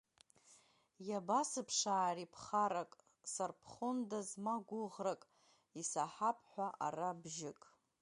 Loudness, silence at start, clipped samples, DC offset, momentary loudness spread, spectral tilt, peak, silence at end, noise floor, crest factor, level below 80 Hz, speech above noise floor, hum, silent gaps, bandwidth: -41 LUFS; 0.5 s; under 0.1%; under 0.1%; 10 LU; -3 dB/octave; -24 dBFS; 0.5 s; -70 dBFS; 18 dB; -86 dBFS; 29 dB; none; none; 11.5 kHz